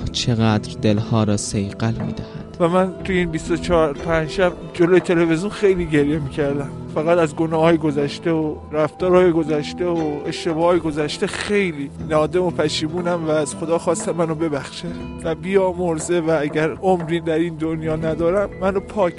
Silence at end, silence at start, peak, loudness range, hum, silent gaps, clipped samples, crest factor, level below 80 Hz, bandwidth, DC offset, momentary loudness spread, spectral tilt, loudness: 0 s; 0 s; -2 dBFS; 3 LU; none; none; under 0.1%; 16 dB; -42 dBFS; 11.5 kHz; under 0.1%; 7 LU; -6 dB/octave; -20 LUFS